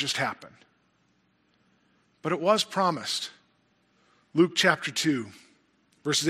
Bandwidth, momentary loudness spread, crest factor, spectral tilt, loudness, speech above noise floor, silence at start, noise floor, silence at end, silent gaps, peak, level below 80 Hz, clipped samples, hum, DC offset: 15.5 kHz; 14 LU; 22 dB; -3.5 dB/octave; -26 LUFS; 42 dB; 0 s; -69 dBFS; 0 s; none; -8 dBFS; -78 dBFS; under 0.1%; none; under 0.1%